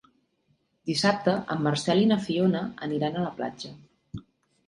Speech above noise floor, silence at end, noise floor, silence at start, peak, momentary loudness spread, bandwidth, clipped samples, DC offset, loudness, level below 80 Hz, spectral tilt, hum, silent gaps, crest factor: 45 dB; 0.45 s; -71 dBFS; 0.85 s; -8 dBFS; 20 LU; 11.5 kHz; under 0.1%; under 0.1%; -26 LUFS; -62 dBFS; -5.5 dB/octave; none; none; 20 dB